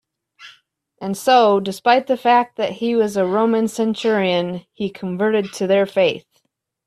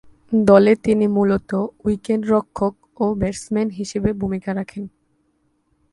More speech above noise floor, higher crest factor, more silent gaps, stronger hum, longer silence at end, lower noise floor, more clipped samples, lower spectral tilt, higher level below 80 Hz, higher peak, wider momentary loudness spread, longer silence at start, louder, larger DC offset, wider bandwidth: about the same, 50 dB vs 47 dB; about the same, 18 dB vs 20 dB; neither; neither; second, 0.65 s vs 1.05 s; about the same, -68 dBFS vs -65 dBFS; neither; second, -5 dB/octave vs -7 dB/octave; second, -64 dBFS vs -44 dBFS; about the same, 0 dBFS vs 0 dBFS; about the same, 11 LU vs 12 LU; about the same, 0.4 s vs 0.3 s; about the same, -18 LUFS vs -19 LUFS; neither; first, 14 kHz vs 11.5 kHz